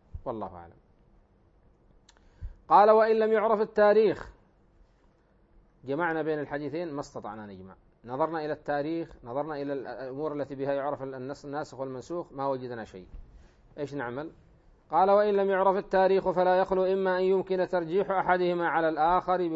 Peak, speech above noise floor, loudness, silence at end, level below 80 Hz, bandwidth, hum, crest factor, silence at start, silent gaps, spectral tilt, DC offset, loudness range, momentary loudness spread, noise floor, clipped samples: -8 dBFS; 36 dB; -27 LUFS; 0 s; -56 dBFS; 7.8 kHz; none; 20 dB; 0.15 s; none; -7 dB/octave; under 0.1%; 10 LU; 18 LU; -63 dBFS; under 0.1%